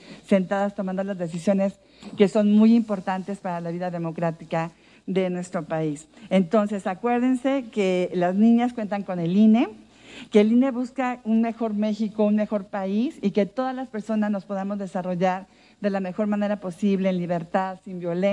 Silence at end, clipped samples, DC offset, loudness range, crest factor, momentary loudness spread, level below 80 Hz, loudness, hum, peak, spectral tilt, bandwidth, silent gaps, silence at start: 0 s; under 0.1%; under 0.1%; 5 LU; 18 dB; 11 LU; -66 dBFS; -24 LUFS; none; -4 dBFS; -7.5 dB/octave; 10 kHz; none; 0.05 s